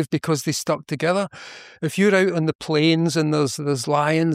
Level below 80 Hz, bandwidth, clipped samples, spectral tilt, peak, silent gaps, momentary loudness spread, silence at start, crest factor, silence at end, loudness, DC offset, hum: -64 dBFS; 15.5 kHz; under 0.1%; -5 dB/octave; -6 dBFS; 2.55-2.59 s; 10 LU; 0 s; 14 dB; 0 s; -21 LUFS; under 0.1%; none